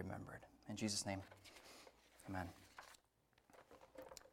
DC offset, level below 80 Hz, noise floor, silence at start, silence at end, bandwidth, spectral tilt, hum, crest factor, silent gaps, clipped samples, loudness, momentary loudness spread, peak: under 0.1%; -76 dBFS; -78 dBFS; 0 s; 0 s; 17 kHz; -3.5 dB/octave; none; 22 dB; none; under 0.1%; -49 LUFS; 22 LU; -30 dBFS